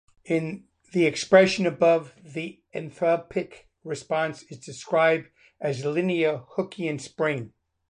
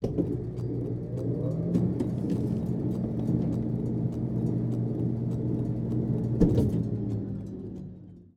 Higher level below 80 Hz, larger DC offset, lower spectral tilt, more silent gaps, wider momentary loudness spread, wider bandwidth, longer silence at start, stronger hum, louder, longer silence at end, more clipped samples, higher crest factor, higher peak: second, -66 dBFS vs -44 dBFS; neither; second, -5.5 dB/octave vs -10.5 dB/octave; neither; first, 17 LU vs 8 LU; first, 10.5 kHz vs 7 kHz; first, 0.25 s vs 0 s; neither; first, -25 LUFS vs -29 LUFS; first, 0.45 s vs 0.1 s; neither; about the same, 22 dB vs 20 dB; first, -4 dBFS vs -8 dBFS